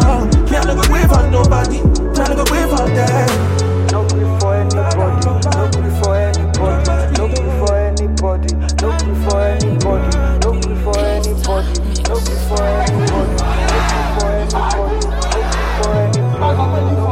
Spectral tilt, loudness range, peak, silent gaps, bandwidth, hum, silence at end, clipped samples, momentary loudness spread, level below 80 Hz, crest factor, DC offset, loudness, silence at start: -5.5 dB/octave; 3 LU; 0 dBFS; none; 16 kHz; none; 0 s; under 0.1%; 4 LU; -18 dBFS; 12 dB; under 0.1%; -15 LUFS; 0 s